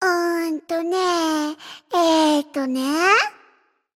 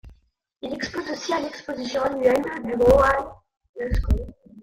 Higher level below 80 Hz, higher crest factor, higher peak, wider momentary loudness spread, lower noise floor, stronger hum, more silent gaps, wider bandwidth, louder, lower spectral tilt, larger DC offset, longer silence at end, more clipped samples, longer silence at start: second, -66 dBFS vs -32 dBFS; about the same, 16 dB vs 20 dB; about the same, -4 dBFS vs -4 dBFS; second, 9 LU vs 16 LU; about the same, -60 dBFS vs -63 dBFS; neither; second, none vs 3.69-3.74 s; about the same, 16 kHz vs 16 kHz; first, -20 LUFS vs -23 LUFS; second, -1.5 dB/octave vs -6 dB/octave; neither; first, 0.65 s vs 0 s; neither; about the same, 0 s vs 0.05 s